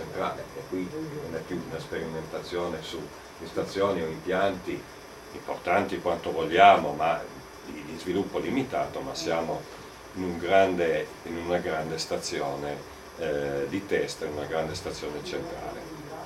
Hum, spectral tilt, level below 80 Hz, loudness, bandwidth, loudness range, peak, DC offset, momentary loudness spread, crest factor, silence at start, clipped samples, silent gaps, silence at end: none; -4.5 dB/octave; -56 dBFS; -29 LUFS; 15.5 kHz; 7 LU; -2 dBFS; under 0.1%; 15 LU; 28 dB; 0 s; under 0.1%; none; 0 s